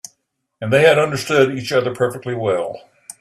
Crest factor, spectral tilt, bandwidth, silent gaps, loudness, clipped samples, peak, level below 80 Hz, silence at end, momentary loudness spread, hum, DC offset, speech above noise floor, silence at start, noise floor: 18 dB; -5 dB/octave; 14 kHz; none; -17 LUFS; under 0.1%; 0 dBFS; -58 dBFS; 0.4 s; 13 LU; none; under 0.1%; 51 dB; 0.6 s; -68 dBFS